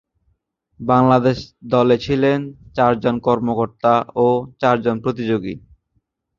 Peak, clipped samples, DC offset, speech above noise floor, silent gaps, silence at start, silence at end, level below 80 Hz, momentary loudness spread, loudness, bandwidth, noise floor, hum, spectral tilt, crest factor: -2 dBFS; under 0.1%; under 0.1%; 51 dB; none; 0.8 s; 0.8 s; -50 dBFS; 8 LU; -18 LUFS; 7.2 kHz; -68 dBFS; none; -8 dB/octave; 16 dB